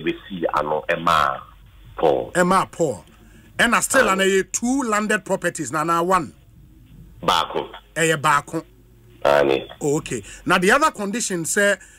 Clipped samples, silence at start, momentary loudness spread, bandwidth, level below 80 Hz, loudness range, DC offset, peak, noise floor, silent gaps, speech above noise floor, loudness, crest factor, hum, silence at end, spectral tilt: under 0.1%; 0 s; 12 LU; 16 kHz; -48 dBFS; 3 LU; under 0.1%; -6 dBFS; -49 dBFS; none; 29 dB; -20 LUFS; 16 dB; none; 0.15 s; -3.5 dB/octave